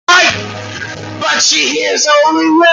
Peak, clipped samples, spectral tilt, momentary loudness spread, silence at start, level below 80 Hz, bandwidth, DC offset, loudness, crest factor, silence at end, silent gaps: 0 dBFS; under 0.1%; -1.5 dB/octave; 15 LU; 0.1 s; -54 dBFS; 10.5 kHz; under 0.1%; -10 LUFS; 12 dB; 0 s; none